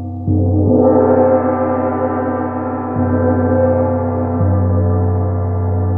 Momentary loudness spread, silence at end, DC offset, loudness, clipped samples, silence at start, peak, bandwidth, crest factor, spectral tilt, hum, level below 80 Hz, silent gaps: 7 LU; 0 s; under 0.1%; -15 LUFS; under 0.1%; 0 s; -2 dBFS; 2.6 kHz; 12 dB; -14 dB/octave; none; -42 dBFS; none